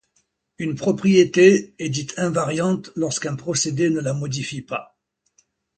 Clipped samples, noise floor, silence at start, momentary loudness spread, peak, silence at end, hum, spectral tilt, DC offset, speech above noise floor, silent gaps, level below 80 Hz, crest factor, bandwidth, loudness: under 0.1%; -68 dBFS; 0.6 s; 14 LU; 0 dBFS; 0.95 s; none; -5 dB/octave; under 0.1%; 48 dB; none; -60 dBFS; 20 dB; 9.2 kHz; -21 LUFS